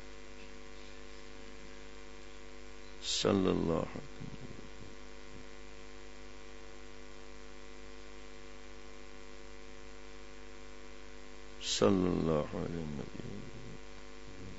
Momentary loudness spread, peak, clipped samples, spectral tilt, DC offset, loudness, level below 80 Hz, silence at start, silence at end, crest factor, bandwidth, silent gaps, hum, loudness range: 21 LU; -14 dBFS; under 0.1%; -5 dB/octave; 0.5%; -35 LUFS; -56 dBFS; 0 s; 0 s; 26 dB; 7.6 kHz; none; none; 16 LU